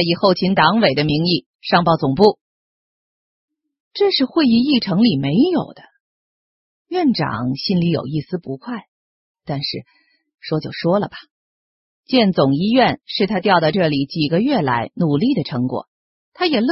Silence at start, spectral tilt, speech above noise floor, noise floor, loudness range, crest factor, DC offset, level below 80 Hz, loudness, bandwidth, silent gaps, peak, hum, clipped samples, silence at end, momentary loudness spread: 0 s; -8.5 dB/octave; over 73 dB; under -90 dBFS; 7 LU; 18 dB; under 0.1%; -52 dBFS; -17 LUFS; 6 kHz; 1.46-1.59 s, 2.41-3.48 s, 3.80-3.91 s, 6.00-6.85 s, 8.88-9.35 s, 11.31-12.03 s, 15.88-16.32 s; 0 dBFS; none; under 0.1%; 0 s; 13 LU